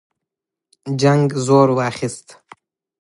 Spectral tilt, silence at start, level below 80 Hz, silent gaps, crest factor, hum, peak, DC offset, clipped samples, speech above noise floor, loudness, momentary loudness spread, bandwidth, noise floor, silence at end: -6.5 dB/octave; 0.85 s; -62 dBFS; none; 18 dB; none; -2 dBFS; under 0.1%; under 0.1%; 68 dB; -17 LUFS; 17 LU; 11.5 kHz; -84 dBFS; 0.8 s